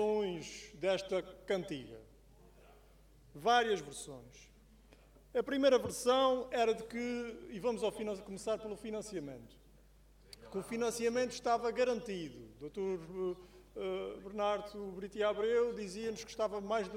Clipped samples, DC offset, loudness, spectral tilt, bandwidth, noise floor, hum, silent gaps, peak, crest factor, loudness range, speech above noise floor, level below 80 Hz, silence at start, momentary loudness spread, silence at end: under 0.1%; under 0.1%; -36 LUFS; -4 dB/octave; 16 kHz; -63 dBFS; none; none; -18 dBFS; 20 dB; 7 LU; 27 dB; -64 dBFS; 0 s; 16 LU; 0 s